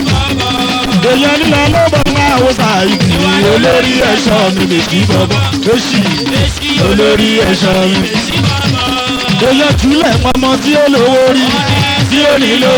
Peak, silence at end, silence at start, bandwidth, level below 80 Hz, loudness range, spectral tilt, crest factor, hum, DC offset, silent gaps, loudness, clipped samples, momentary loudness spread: 0 dBFS; 0 s; 0 s; over 20 kHz; -28 dBFS; 1 LU; -5 dB/octave; 10 dB; none; under 0.1%; none; -9 LUFS; under 0.1%; 4 LU